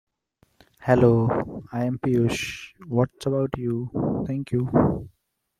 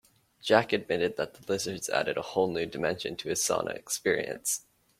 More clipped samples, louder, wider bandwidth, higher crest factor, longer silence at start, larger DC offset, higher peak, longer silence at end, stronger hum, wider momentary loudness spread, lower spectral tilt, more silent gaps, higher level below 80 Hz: neither; first, -24 LUFS vs -30 LUFS; second, 14 kHz vs 16.5 kHz; second, 20 dB vs 26 dB; first, 0.8 s vs 0.45 s; neither; about the same, -4 dBFS vs -6 dBFS; about the same, 0.5 s vs 0.4 s; neither; first, 12 LU vs 7 LU; first, -7.5 dB/octave vs -3 dB/octave; neither; first, -50 dBFS vs -66 dBFS